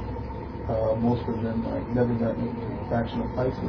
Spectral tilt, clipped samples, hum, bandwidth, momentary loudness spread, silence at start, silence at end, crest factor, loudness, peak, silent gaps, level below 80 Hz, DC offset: -10 dB/octave; under 0.1%; none; 5.4 kHz; 9 LU; 0 s; 0 s; 16 dB; -28 LUFS; -12 dBFS; none; -40 dBFS; under 0.1%